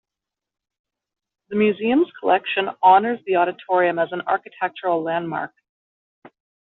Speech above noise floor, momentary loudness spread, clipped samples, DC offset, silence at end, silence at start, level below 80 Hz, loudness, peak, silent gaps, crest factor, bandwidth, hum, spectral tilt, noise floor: 67 dB; 12 LU; under 0.1%; under 0.1%; 1.35 s; 1.5 s; -70 dBFS; -20 LUFS; -4 dBFS; none; 18 dB; 4.1 kHz; none; -3 dB/octave; -87 dBFS